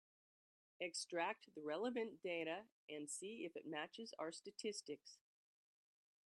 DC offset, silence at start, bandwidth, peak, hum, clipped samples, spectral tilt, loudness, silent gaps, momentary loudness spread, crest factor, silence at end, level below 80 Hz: under 0.1%; 0.8 s; 12 kHz; -28 dBFS; none; under 0.1%; -2.5 dB/octave; -48 LUFS; 2.72-2.88 s; 10 LU; 22 dB; 1.1 s; under -90 dBFS